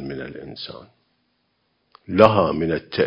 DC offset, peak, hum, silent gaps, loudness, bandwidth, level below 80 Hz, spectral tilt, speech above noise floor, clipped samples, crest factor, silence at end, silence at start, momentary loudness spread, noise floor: under 0.1%; 0 dBFS; none; none; -18 LUFS; 8 kHz; -48 dBFS; -8 dB/octave; 49 dB; under 0.1%; 22 dB; 0 s; 0 s; 20 LU; -69 dBFS